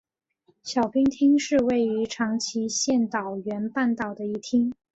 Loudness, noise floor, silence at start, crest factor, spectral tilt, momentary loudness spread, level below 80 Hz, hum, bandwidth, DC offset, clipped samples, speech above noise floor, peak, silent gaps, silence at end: -25 LUFS; -67 dBFS; 0.65 s; 14 dB; -4 dB/octave; 9 LU; -60 dBFS; none; 8.2 kHz; under 0.1%; under 0.1%; 42 dB; -10 dBFS; none; 0.2 s